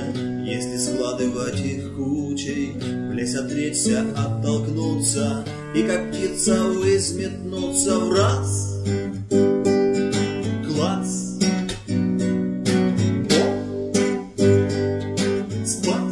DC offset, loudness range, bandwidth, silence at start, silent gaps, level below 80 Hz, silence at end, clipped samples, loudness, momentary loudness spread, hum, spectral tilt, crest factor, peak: under 0.1%; 3 LU; 12 kHz; 0 s; none; -50 dBFS; 0 s; under 0.1%; -22 LUFS; 7 LU; none; -5 dB/octave; 18 dB; -4 dBFS